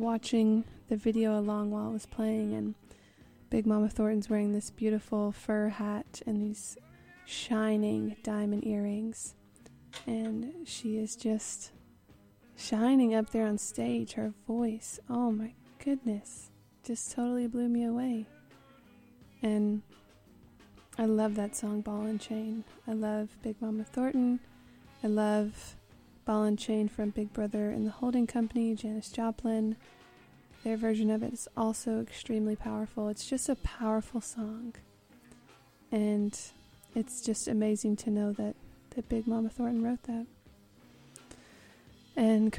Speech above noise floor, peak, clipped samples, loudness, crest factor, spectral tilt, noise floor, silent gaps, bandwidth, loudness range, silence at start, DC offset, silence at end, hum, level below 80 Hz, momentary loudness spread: 29 dB; -16 dBFS; under 0.1%; -33 LUFS; 18 dB; -5.5 dB/octave; -60 dBFS; none; 13 kHz; 4 LU; 0 s; under 0.1%; 0 s; none; -58 dBFS; 11 LU